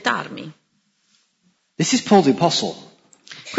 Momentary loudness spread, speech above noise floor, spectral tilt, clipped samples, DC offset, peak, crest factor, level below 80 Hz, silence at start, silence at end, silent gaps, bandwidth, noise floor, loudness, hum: 25 LU; 48 dB; -4 dB/octave; under 0.1%; under 0.1%; -2 dBFS; 20 dB; -68 dBFS; 0.05 s; 0 s; none; 8 kHz; -66 dBFS; -18 LUFS; none